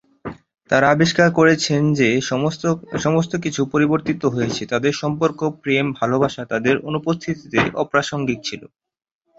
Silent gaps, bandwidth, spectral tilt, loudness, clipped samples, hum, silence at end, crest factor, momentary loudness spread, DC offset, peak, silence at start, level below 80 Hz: none; 8 kHz; -5.5 dB/octave; -19 LUFS; under 0.1%; none; 0.7 s; 18 dB; 8 LU; under 0.1%; 0 dBFS; 0.25 s; -52 dBFS